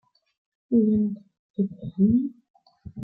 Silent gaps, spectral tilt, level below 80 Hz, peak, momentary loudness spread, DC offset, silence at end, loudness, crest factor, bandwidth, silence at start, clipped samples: 1.39-1.54 s, 2.50-2.54 s; -14 dB/octave; -56 dBFS; -10 dBFS; 17 LU; under 0.1%; 0 s; -24 LUFS; 16 dB; 1 kHz; 0.7 s; under 0.1%